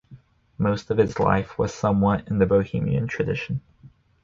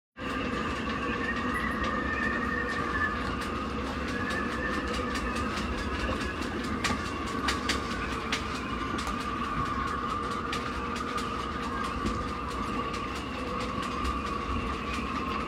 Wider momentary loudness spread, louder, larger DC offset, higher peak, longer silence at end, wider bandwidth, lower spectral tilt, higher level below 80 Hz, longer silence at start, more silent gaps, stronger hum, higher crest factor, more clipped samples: first, 7 LU vs 4 LU; first, -23 LUFS vs -31 LUFS; neither; first, -6 dBFS vs -14 dBFS; first, 0.35 s vs 0 s; second, 7.6 kHz vs 16 kHz; first, -7.5 dB/octave vs -4.5 dB/octave; about the same, -44 dBFS vs -42 dBFS; about the same, 0.1 s vs 0.15 s; neither; neither; about the same, 18 dB vs 18 dB; neither